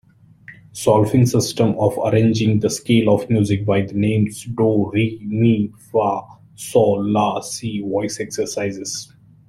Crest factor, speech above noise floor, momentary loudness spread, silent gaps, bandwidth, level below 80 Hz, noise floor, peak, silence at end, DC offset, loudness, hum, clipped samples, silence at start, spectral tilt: 16 dB; 27 dB; 9 LU; none; 15 kHz; -52 dBFS; -45 dBFS; -2 dBFS; 0.45 s; under 0.1%; -19 LUFS; none; under 0.1%; 0.5 s; -6 dB/octave